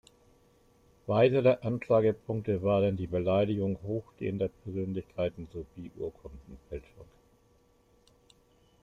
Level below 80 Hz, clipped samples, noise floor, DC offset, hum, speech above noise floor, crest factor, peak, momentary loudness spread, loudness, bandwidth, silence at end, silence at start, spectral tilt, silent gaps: -58 dBFS; under 0.1%; -66 dBFS; under 0.1%; none; 36 dB; 20 dB; -12 dBFS; 18 LU; -30 LUFS; 7.6 kHz; 1.8 s; 1.05 s; -9 dB/octave; none